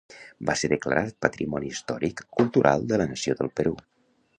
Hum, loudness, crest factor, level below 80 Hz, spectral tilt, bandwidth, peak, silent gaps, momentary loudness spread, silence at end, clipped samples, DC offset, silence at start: none; -26 LUFS; 24 dB; -54 dBFS; -5 dB/octave; 10.5 kHz; -2 dBFS; none; 9 LU; 0.6 s; under 0.1%; under 0.1%; 0.1 s